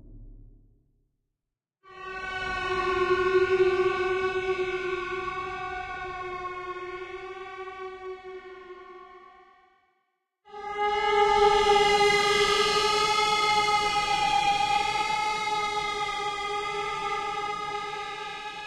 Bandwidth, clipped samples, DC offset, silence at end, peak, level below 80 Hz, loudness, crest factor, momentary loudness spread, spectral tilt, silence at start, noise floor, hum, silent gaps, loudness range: 14 kHz; under 0.1%; under 0.1%; 0 s; -10 dBFS; -52 dBFS; -26 LUFS; 18 dB; 18 LU; -2.5 dB/octave; 0.05 s; -87 dBFS; none; none; 16 LU